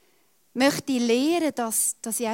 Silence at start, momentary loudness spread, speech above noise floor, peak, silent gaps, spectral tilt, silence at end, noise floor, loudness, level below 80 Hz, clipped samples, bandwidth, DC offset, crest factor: 0.55 s; 4 LU; 41 dB; -6 dBFS; none; -2.5 dB/octave; 0 s; -65 dBFS; -23 LUFS; -72 dBFS; under 0.1%; 16.5 kHz; under 0.1%; 18 dB